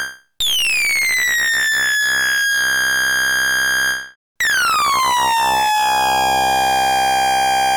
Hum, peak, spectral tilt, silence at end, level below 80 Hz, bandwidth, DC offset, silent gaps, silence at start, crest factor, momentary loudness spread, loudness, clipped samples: none; -12 dBFS; 0.5 dB/octave; 0 s; -48 dBFS; over 20 kHz; under 0.1%; 4.16-4.35 s; 0 s; 4 dB; 3 LU; -15 LUFS; under 0.1%